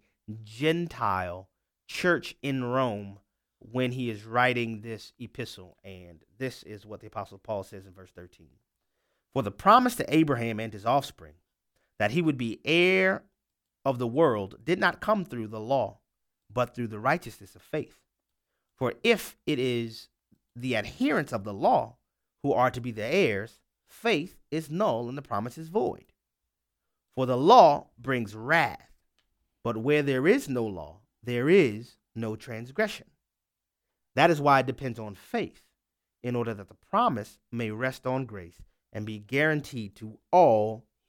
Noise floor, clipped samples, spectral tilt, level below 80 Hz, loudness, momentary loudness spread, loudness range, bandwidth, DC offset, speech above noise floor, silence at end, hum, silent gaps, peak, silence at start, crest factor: -87 dBFS; under 0.1%; -6 dB/octave; -62 dBFS; -27 LUFS; 19 LU; 8 LU; 17.5 kHz; under 0.1%; 60 dB; 0.3 s; none; none; -4 dBFS; 0.3 s; 24 dB